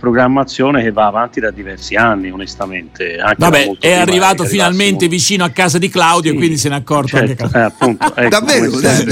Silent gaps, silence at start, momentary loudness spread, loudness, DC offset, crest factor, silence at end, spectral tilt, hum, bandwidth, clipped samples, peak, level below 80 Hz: none; 0.05 s; 10 LU; -12 LUFS; under 0.1%; 12 dB; 0 s; -4 dB/octave; none; 16.5 kHz; under 0.1%; 0 dBFS; -42 dBFS